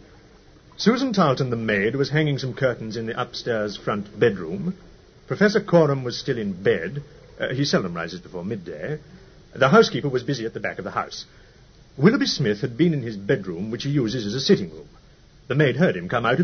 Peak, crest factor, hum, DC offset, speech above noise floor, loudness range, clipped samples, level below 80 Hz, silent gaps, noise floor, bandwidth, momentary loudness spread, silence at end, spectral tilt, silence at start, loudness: -2 dBFS; 20 dB; none; under 0.1%; 29 dB; 3 LU; under 0.1%; -54 dBFS; none; -51 dBFS; 6.6 kHz; 13 LU; 0 s; -6 dB/octave; 0.8 s; -23 LUFS